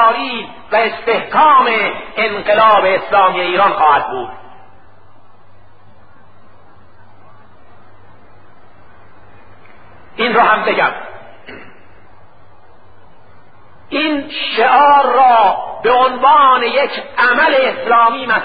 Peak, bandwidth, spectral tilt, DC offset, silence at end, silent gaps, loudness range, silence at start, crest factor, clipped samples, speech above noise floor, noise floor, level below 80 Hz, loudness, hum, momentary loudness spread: 0 dBFS; 5 kHz; -8 dB/octave; 2%; 0 s; none; 12 LU; 0 s; 14 dB; under 0.1%; 34 dB; -46 dBFS; -54 dBFS; -12 LUFS; none; 10 LU